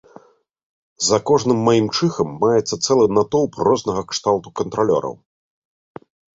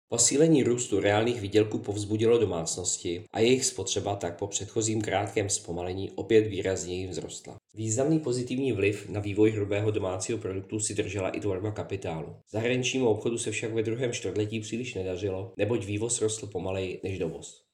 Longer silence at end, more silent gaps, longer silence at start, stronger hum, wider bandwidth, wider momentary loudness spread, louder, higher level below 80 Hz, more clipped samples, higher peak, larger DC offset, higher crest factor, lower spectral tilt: first, 1.25 s vs 0.2 s; neither; first, 1 s vs 0.1 s; neither; second, 8 kHz vs 13 kHz; second, 6 LU vs 10 LU; first, -18 LUFS vs -28 LUFS; first, -54 dBFS vs -66 dBFS; neither; first, -2 dBFS vs -8 dBFS; neither; about the same, 18 dB vs 20 dB; about the same, -5 dB/octave vs -4.5 dB/octave